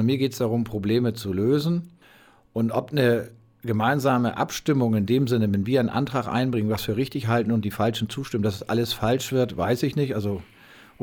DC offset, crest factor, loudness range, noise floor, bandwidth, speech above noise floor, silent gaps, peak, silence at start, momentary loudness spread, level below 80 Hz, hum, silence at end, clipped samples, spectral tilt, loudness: under 0.1%; 16 dB; 2 LU; -54 dBFS; 19 kHz; 31 dB; none; -8 dBFS; 0 s; 6 LU; -54 dBFS; none; 0.6 s; under 0.1%; -6.5 dB/octave; -24 LUFS